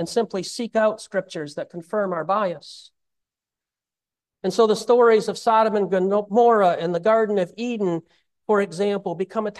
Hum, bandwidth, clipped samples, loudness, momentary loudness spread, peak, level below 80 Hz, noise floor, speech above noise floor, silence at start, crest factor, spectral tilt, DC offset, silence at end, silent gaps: none; 12.5 kHz; under 0.1%; -21 LUFS; 13 LU; -6 dBFS; -72 dBFS; under -90 dBFS; over 69 dB; 0 s; 16 dB; -5.5 dB/octave; under 0.1%; 0 s; none